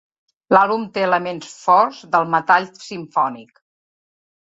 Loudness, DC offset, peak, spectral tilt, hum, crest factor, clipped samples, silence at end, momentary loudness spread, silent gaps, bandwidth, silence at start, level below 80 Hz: -18 LUFS; under 0.1%; 0 dBFS; -5 dB/octave; none; 20 dB; under 0.1%; 1 s; 13 LU; none; 8 kHz; 0.5 s; -68 dBFS